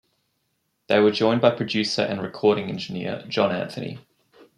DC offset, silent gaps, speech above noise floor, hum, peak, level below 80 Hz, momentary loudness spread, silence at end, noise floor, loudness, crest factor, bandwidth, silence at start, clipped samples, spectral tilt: under 0.1%; none; 51 dB; none; -2 dBFS; -68 dBFS; 12 LU; 0.6 s; -73 dBFS; -23 LUFS; 22 dB; 11 kHz; 0.9 s; under 0.1%; -5.5 dB/octave